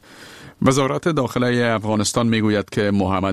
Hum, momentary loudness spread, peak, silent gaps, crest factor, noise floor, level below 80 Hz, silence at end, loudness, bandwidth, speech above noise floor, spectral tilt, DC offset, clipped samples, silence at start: none; 3 LU; -2 dBFS; none; 18 dB; -41 dBFS; -50 dBFS; 0 s; -19 LUFS; 14 kHz; 23 dB; -5.5 dB/octave; 0.3%; under 0.1%; 0.1 s